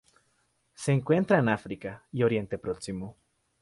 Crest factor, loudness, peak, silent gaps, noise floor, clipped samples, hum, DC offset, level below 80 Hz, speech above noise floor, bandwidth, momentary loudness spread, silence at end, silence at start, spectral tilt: 20 dB; -28 LUFS; -10 dBFS; none; -72 dBFS; under 0.1%; none; under 0.1%; -60 dBFS; 44 dB; 11.5 kHz; 15 LU; 0.5 s; 0.8 s; -7 dB/octave